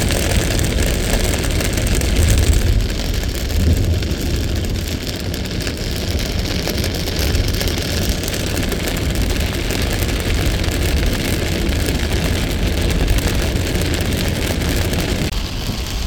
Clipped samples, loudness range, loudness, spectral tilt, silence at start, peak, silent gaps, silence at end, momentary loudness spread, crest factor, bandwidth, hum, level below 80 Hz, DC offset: under 0.1%; 3 LU; -19 LUFS; -4.5 dB/octave; 0 s; -2 dBFS; none; 0 s; 5 LU; 16 dB; over 20 kHz; none; -22 dBFS; under 0.1%